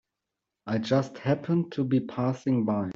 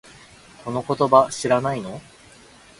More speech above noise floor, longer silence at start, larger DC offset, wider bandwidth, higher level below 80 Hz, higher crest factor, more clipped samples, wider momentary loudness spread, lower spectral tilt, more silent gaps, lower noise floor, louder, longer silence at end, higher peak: first, 59 dB vs 28 dB; about the same, 0.65 s vs 0.65 s; neither; second, 7.6 kHz vs 11.5 kHz; second, -66 dBFS vs -58 dBFS; second, 16 dB vs 22 dB; neither; second, 5 LU vs 20 LU; first, -8 dB/octave vs -5 dB/octave; neither; first, -86 dBFS vs -49 dBFS; second, -28 LUFS vs -20 LUFS; second, 0.05 s vs 0.8 s; second, -10 dBFS vs 0 dBFS